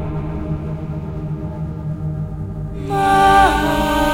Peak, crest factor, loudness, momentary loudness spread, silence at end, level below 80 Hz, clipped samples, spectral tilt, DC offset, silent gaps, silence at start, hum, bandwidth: 0 dBFS; 18 dB; -18 LUFS; 15 LU; 0 s; -30 dBFS; under 0.1%; -5.5 dB/octave; under 0.1%; none; 0 s; none; 16.5 kHz